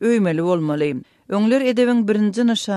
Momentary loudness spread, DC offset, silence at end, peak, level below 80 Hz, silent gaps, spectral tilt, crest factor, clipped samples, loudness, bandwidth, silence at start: 7 LU; under 0.1%; 0 s; -6 dBFS; -66 dBFS; none; -6 dB/octave; 12 dB; under 0.1%; -19 LUFS; 12 kHz; 0 s